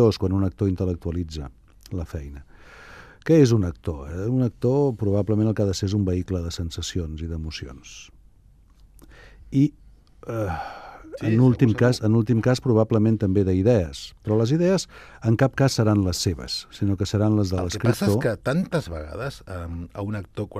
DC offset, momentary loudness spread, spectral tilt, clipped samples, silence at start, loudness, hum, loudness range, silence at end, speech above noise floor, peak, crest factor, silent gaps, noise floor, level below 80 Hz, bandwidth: under 0.1%; 15 LU; -7 dB/octave; under 0.1%; 0 s; -23 LUFS; none; 9 LU; 0 s; 31 dB; -4 dBFS; 18 dB; none; -53 dBFS; -46 dBFS; 14.5 kHz